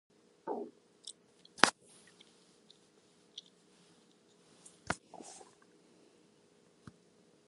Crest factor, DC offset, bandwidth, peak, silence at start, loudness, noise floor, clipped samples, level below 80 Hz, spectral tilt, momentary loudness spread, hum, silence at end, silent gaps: 42 dB; under 0.1%; 11.5 kHz; 0 dBFS; 0.45 s; -36 LUFS; -67 dBFS; under 0.1%; -74 dBFS; -1.5 dB/octave; 30 LU; none; 2.1 s; none